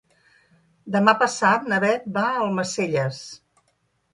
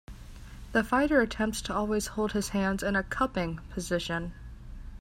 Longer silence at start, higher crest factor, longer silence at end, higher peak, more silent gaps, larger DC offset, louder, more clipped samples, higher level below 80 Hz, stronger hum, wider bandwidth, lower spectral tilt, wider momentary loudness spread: first, 0.85 s vs 0.1 s; about the same, 22 dB vs 18 dB; first, 0.75 s vs 0 s; first, -2 dBFS vs -12 dBFS; neither; neither; first, -21 LUFS vs -29 LUFS; neither; second, -68 dBFS vs -44 dBFS; neither; second, 11.5 kHz vs 16 kHz; about the same, -4.5 dB/octave vs -5 dB/octave; second, 9 LU vs 22 LU